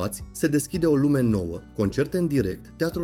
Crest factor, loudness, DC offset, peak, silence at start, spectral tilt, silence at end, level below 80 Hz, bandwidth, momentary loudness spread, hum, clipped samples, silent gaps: 14 dB; -24 LUFS; under 0.1%; -10 dBFS; 0 s; -6.5 dB/octave; 0 s; -44 dBFS; 17 kHz; 9 LU; none; under 0.1%; none